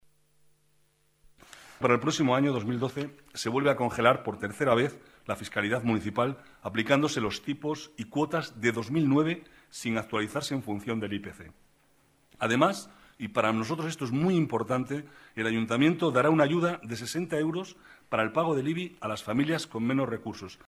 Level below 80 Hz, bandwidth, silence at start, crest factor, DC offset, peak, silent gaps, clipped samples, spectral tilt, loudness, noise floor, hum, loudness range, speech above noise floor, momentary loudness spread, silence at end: -64 dBFS; 14.5 kHz; 1.55 s; 22 dB; under 0.1%; -8 dBFS; none; under 0.1%; -5.5 dB/octave; -29 LUFS; -68 dBFS; none; 4 LU; 39 dB; 12 LU; 0.1 s